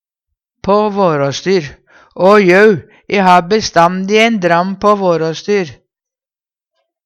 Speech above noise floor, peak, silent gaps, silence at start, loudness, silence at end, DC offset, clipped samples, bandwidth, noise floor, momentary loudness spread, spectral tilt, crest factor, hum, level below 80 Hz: over 79 dB; 0 dBFS; none; 0.65 s; -11 LUFS; 1.3 s; under 0.1%; under 0.1%; 10.5 kHz; under -90 dBFS; 8 LU; -5.5 dB/octave; 12 dB; none; -48 dBFS